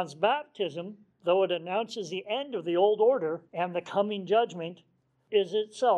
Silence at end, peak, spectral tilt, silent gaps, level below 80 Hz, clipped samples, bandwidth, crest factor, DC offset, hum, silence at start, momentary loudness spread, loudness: 0 s; -12 dBFS; -5 dB/octave; none; -84 dBFS; under 0.1%; 9.8 kHz; 18 dB; under 0.1%; none; 0 s; 10 LU; -29 LUFS